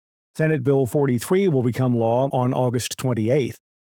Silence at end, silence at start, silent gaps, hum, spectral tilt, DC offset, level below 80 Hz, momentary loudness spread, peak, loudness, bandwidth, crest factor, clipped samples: 0.45 s; 0.35 s; none; none; -6.5 dB/octave; under 0.1%; -64 dBFS; 5 LU; -8 dBFS; -21 LUFS; 19.5 kHz; 14 dB; under 0.1%